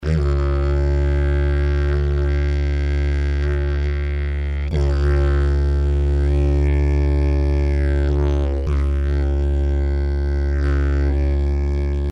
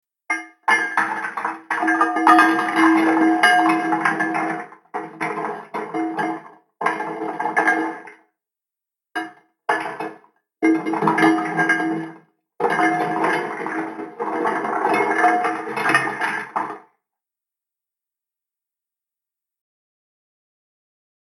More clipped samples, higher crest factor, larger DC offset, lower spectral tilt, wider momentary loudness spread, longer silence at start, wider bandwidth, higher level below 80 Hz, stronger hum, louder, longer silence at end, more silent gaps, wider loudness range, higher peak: neither; second, 10 dB vs 20 dB; neither; first, -8.5 dB/octave vs -4.5 dB/octave; second, 3 LU vs 15 LU; second, 0 s vs 0.3 s; second, 6 kHz vs 13.5 kHz; first, -18 dBFS vs -84 dBFS; neither; about the same, -20 LUFS vs -20 LUFS; second, 0 s vs 4.6 s; neither; second, 2 LU vs 9 LU; second, -8 dBFS vs 0 dBFS